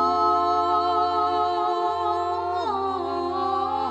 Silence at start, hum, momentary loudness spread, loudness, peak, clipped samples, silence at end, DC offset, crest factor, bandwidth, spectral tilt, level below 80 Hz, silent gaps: 0 s; none; 5 LU; -23 LUFS; -10 dBFS; under 0.1%; 0 s; under 0.1%; 14 dB; 9 kHz; -5.5 dB/octave; -58 dBFS; none